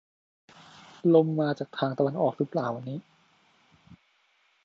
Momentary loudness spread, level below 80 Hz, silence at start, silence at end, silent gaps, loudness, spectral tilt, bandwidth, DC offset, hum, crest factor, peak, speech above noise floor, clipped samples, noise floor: 13 LU; -76 dBFS; 1.05 s; 0.7 s; none; -27 LUFS; -8.5 dB/octave; 7.2 kHz; under 0.1%; none; 22 dB; -8 dBFS; 42 dB; under 0.1%; -68 dBFS